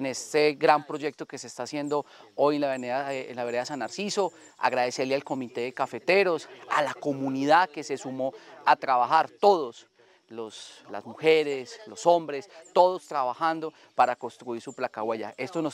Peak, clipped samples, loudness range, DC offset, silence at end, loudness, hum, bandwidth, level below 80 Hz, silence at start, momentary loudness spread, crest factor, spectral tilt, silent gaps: -4 dBFS; under 0.1%; 4 LU; under 0.1%; 0 s; -27 LUFS; none; 15.5 kHz; -84 dBFS; 0 s; 15 LU; 24 dB; -4 dB/octave; none